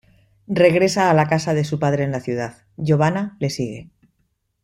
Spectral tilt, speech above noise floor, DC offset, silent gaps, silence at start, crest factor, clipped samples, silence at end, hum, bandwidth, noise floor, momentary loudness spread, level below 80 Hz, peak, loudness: -6 dB/octave; 50 dB; under 0.1%; none; 0.5 s; 18 dB; under 0.1%; 0.8 s; none; 13 kHz; -69 dBFS; 12 LU; -54 dBFS; -2 dBFS; -19 LUFS